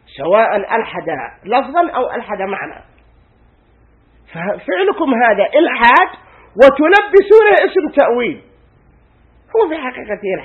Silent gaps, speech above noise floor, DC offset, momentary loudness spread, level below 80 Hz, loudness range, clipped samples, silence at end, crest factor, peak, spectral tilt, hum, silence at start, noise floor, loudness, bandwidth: none; 38 dB; under 0.1%; 15 LU; -50 dBFS; 11 LU; 0.3%; 0 s; 14 dB; 0 dBFS; -6 dB/octave; none; 0.15 s; -51 dBFS; -13 LUFS; 7 kHz